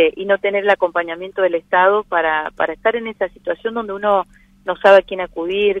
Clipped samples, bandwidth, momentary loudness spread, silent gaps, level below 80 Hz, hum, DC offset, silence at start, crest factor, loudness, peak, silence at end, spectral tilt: under 0.1%; 7.4 kHz; 11 LU; none; -52 dBFS; none; under 0.1%; 0 s; 16 dB; -17 LUFS; 0 dBFS; 0 s; -5.5 dB/octave